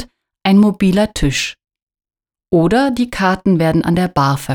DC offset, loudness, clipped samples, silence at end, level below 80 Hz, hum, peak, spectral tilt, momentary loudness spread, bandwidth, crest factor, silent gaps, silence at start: under 0.1%; -15 LUFS; under 0.1%; 0 s; -36 dBFS; none; -2 dBFS; -6 dB/octave; 6 LU; 17.5 kHz; 14 dB; 1.83-1.87 s; 0 s